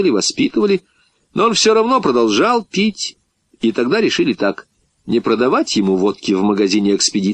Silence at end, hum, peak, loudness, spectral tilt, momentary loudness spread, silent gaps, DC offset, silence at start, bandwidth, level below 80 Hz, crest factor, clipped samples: 0 s; none; -2 dBFS; -16 LUFS; -4 dB/octave; 8 LU; none; under 0.1%; 0 s; 10 kHz; -58 dBFS; 14 dB; under 0.1%